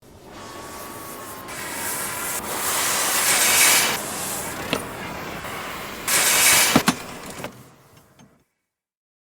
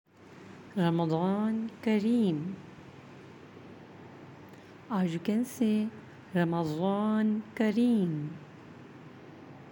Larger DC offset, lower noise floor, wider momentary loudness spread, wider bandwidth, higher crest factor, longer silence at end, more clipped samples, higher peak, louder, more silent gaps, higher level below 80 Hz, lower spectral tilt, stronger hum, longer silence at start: neither; first, -80 dBFS vs -51 dBFS; about the same, 21 LU vs 23 LU; first, over 20 kHz vs 17 kHz; about the same, 22 dB vs 18 dB; first, 1.55 s vs 0 s; neither; first, -2 dBFS vs -14 dBFS; first, -19 LUFS vs -30 LUFS; neither; first, -54 dBFS vs -76 dBFS; second, -1 dB/octave vs -7.5 dB/octave; neither; second, 0.1 s vs 0.3 s